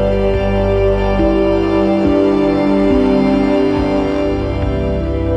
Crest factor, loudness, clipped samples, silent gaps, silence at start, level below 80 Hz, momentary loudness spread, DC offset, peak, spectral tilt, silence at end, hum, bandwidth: 12 dB; -14 LUFS; under 0.1%; none; 0 s; -24 dBFS; 5 LU; under 0.1%; -2 dBFS; -8.5 dB/octave; 0 s; 50 Hz at -30 dBFS; 9 kHz